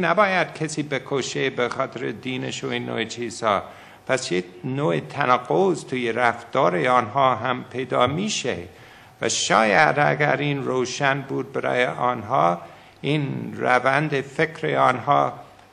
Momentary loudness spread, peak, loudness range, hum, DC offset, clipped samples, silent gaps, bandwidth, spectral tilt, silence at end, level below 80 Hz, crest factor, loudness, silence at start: 10 LU; -2 dBFS; 5 LU; none; under 0.1%; under 0.1%; none; 11.5 kHz; -4.5 dB/octave; 0.25 s; -64 dBFS; 20 dB; -22 LUFS; 0 s